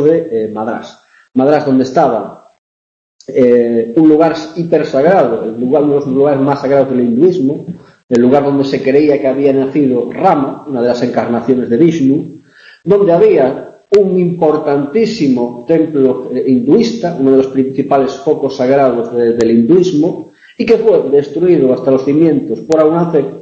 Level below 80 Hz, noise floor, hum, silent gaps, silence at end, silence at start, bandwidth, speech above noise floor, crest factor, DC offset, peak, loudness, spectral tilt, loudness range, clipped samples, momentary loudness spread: -52 dBFS; -40 dBFS; none; 2.58-3.19 s, 8.04-8.08 s; 0 s; 0 s; 7.8 kHz; 29 dB; 12 dB; under 0.1%; 0 dBFS; -12 LUFS; -7.5 dB/octave; 1 LU; under 0.1%; 8 LU